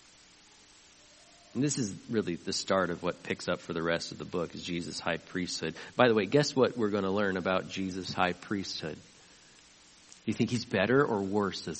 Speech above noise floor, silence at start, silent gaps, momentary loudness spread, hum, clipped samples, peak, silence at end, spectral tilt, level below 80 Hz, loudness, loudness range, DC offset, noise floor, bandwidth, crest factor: 28 dB; 1.55 s; none; 10 LU; none; under 0.1%; -6 dBFS; 0 s; -4.5 dB/octave; -66 dBFS; -31 LUFS; 5 LU; under 0.1%; -58 dBFS; 8.4 kHz; 26 dB